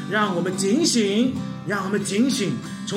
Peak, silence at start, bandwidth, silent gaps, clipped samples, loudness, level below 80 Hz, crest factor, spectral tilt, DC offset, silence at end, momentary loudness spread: -8 dBFS; 0 s; 16.5 kHz; none; under 0.1%; -22 LUFS; -64 dBFS; 14 dB; -4 dB/octave; under 0.1%; 0 s; 8 LU